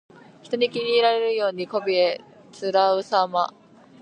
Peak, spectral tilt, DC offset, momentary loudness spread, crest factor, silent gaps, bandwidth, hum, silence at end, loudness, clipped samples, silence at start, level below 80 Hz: -6 dBFS; -4.5 dB/octave; under 0.1%; 9 LU; 18 dB; none; 9.6 kHz; none; 0.55 s; -22 LUFS; under 0.1%; 0.45 s; -80 dBFS